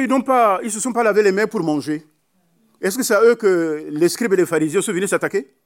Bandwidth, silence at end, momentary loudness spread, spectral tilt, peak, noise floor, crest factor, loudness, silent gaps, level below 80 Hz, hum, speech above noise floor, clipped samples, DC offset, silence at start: 16.5 kHz; 0.2 s; 9 LU; -4.5 dB/octave; -4 dBFS; -63 dBFS; 14 dB; -18 LUFS; none; -80 dBFS; none; 46 dB; under 0.1%; under 0.1%; 0 s